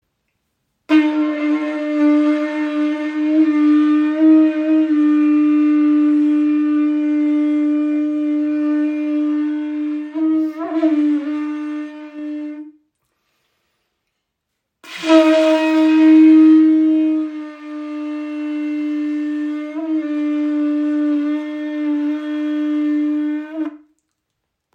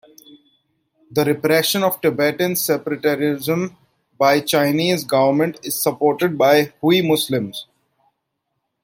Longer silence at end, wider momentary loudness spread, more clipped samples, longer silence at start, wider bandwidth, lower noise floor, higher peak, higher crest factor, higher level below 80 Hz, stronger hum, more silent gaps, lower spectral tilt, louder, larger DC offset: second, 0.95 s vs 1.2 s; first, 14 LU vs 7 LU; neither; second, 0.9 s vs 1.1 s; second, 7 kHz vs 17 kHz; about the same, -76 dBFS vs -75 dBFS; about the same, -2 dBFS vs -2 dBFS; about the same, 16 dB vs 16 dB; second, -76 dBFS vs -64 dBFS; neither; neither; about the same, -4.5 dB/octave vs -4.5 dB/octave; about the same, -16 LUFS vs -18 LUFS; neither